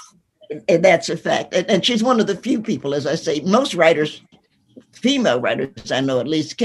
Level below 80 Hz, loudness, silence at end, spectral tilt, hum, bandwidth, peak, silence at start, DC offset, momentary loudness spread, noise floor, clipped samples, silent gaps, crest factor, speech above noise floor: -60 dBFS; -18 LUFS; 0 s; -4.5 dB/octave; none; 12 kHz; 0 dBFS; 0 s; under 0.1%; 8 LU; -49 dBFS; under 0.1%; none; 18 dB; 31 dB